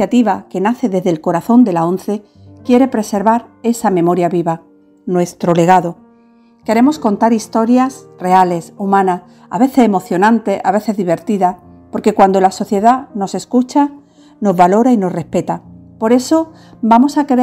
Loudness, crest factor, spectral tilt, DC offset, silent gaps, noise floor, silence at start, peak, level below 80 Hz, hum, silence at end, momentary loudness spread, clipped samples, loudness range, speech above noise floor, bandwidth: -14 LUFS; 14 dB; -6.5 dB/octave; under 0.1%; none; -48 dBFS; 0 s; 0 dBFS; -56 dBFS; none; 0 s; 10 LU; 0.1%; 2 LU; 35 dB; 15.5 kHz